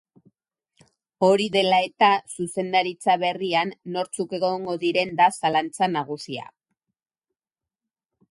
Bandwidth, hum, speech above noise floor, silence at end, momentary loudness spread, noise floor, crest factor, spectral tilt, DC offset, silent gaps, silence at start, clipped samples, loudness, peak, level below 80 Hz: 11.5 kHz; none; over 67 dB; 1.85 s; 10 LU; under -90 dBFS; 20 dB; -4 dB/octave; under 0.1%; none; 1.2 s; under 0.1%; -23 LUFS; -4 dBFS; -70 dBFS